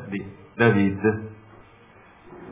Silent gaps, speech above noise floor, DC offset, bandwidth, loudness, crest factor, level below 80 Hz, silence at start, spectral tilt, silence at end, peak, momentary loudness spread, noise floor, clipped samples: none; 30 dB; under 0.1%; 3.8 kHz; -23 LUFS; 20 dB; -52 dBFS; 0 s; -11.5 dB/octave; 0 s; -4 dBFS; 22 LU; -51 dBFS; under 0.1%